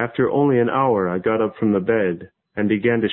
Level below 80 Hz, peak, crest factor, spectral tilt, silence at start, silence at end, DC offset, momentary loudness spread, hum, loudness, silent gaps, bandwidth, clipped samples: -54 dBFS; -6 dBFS; 14 dB; -12 dB/octave; 0 s; 0 s; under 0.1%; 7 LU; none; -19 LUFS; none; 4 kHz; under 0.1%